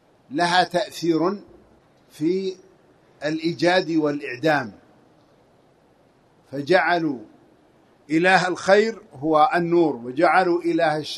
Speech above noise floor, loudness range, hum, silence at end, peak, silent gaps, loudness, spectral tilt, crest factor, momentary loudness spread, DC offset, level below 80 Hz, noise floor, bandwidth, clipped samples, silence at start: 37 dB; 6 LU; none; 0 s; -2 dBFS; none; -21 LUFS; -5 dB/octave; 20 dB; 12 LU; under 0.1%; -66 dBFS; -58 dBFS; 12.5 kHz; under 0.1%; 0.3 s